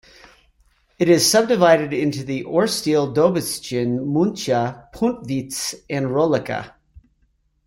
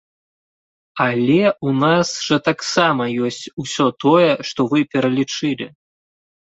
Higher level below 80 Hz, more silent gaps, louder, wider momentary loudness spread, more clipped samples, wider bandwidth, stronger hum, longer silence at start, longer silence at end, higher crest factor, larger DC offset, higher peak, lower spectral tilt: first, -54 dBFS vs -60 dBFS; second, none vs 3.53-3.57 s; about the same, -20 LUFS vs -18 LUFS; about the same, 11 LU vs 9 LU; neither; first, 16.5 kHz vs 8.2 kHz; neither; about the same, 1 s vs 0.95 s; second, 0.7 s vs 0.9 s; about the same, 18 dB vs 18 dB; neither; about the same, -2 dBFS vs 0 dBFS; about the same, -4.5 dB/octave vs -5 dB/octave